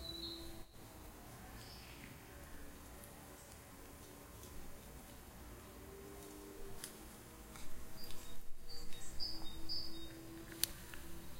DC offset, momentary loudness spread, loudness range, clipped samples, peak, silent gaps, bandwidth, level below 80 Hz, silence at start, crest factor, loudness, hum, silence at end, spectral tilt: under 0.1%; 12 LU; 9 LU; under 0.1%; -12 dBFS; none; 16 kHz; -56 dBFS; 0 s; 32 dB; -50 LUFS; none; 0 s; -2.5 dB/octave